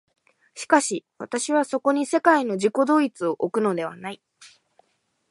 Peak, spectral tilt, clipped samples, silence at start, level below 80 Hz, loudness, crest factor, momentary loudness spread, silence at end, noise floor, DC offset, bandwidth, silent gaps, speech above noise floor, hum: -2 dBFS; -4 dB/octave; under 0.1%; 0.55 s; -78 dBFS; -22 LUFS; 22 dB; 14 LU; 0.85 s; -71 dBFS; under 0.1%; 11.5 kHz; none; 48 dB; none